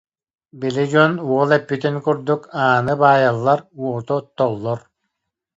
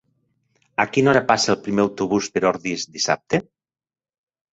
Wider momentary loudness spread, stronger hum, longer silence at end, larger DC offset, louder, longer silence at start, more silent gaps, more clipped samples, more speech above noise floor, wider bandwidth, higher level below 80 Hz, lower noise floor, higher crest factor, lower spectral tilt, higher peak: first, 11 LU vs 8 LU; neither; second, 0.8 s vs 1.1 s; neither; about the same, -18 LUFS vs -20 LUFS; second, 0.55 s vs 0.8 s; neither; neither; first, 60 dB vs 48 dB; about the same, 8 kHz vs 8.4 kHz; about the same, -60 dBFS vs -58 dBFS; first, -78 dBFS vs -68 dBFS; about the same, 18 dB vs 20 dB; first, -7 dB/octave vs -4 dB/octave; about the same, 0 dBFS vs -2 dBFS